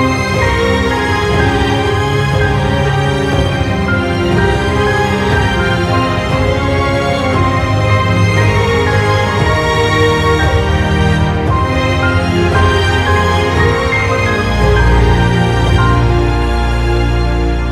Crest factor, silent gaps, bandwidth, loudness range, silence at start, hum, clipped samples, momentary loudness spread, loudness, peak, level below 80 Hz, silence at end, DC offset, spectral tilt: 12 dB; none; 13.5 kHz; 1 LU; 0 s; none; under 0.1%; 3 LU; -12 LUFS; 0 dBFS; -20 dBFS; 0 s; under 0.1%; -6 dB/octave